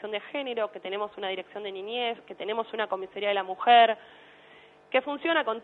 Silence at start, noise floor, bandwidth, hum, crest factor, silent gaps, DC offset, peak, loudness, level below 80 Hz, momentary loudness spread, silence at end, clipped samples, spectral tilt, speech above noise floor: 0 s; -54 dBFS; 4.3 kHz; none; 20 dB; none; under 0.1%; -8 dBFS; -28 LUFS; -80 dBFS; 14 LU; 0 s; under 0.1%; -5.5 dB/octave; 27 dB